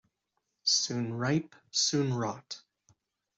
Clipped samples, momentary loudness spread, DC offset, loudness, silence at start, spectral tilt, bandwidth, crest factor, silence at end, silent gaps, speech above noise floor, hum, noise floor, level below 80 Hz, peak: under 0.1%; 14 LU; under 0.1%; -30 LUFS; 0.65 s; -3.5 dB/octave; 8.2 kHz; 18 dB; 0.8 s; none; 51 dB; none; -82 dBFS; -72 dBFS; -14 dBFS